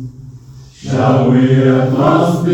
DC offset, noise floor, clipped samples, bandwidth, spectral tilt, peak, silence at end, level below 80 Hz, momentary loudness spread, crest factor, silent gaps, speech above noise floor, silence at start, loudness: under 0.1%; -36 dBFS; under 0.1%; 11.5 kHz; -8 dB/octave; 0 dBFS; 0 s; -46 dBFS; 13 LU; 12 dB; none; 25 dB; 0 s; -12 LUFS